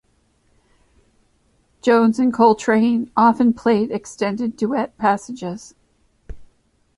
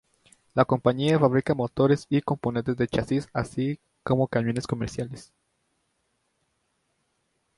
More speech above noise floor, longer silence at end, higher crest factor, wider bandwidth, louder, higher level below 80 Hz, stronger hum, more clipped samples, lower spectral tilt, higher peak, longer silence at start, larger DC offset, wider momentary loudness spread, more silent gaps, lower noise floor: second, 44 dB vs 49 dB; second, 0.55 s vs 2.35 s; about the same, 18 dB vs 22 dB; about the same, 11 kHz vs 11.5 kHz; first, -18 LUFS vs -26 LUFS; about the same, -50 dBFS vs -54 dBFS; neither; neither; second, -6 dB/octave vs -7.5 dB/octave; about the same, -2 dBFS vs -4 dBFS; first, 1.85 s vs 0.55 s; neither; about the same, 10 LU vs 9 LU; neither; second, -62 dBFS vs -74 dBFS